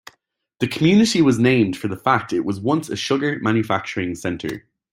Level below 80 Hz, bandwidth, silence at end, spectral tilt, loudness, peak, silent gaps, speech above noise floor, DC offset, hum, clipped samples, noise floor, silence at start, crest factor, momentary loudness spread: -56 dBFS; 16 kHz; 0.35 s; -5.5 dB/octave; -19 LUFS; -2 dBFS; none; 47 dB; under 0.1%; none; under 0.1%; -66 dBFS; 0.6 s; 18 dB; 11 LU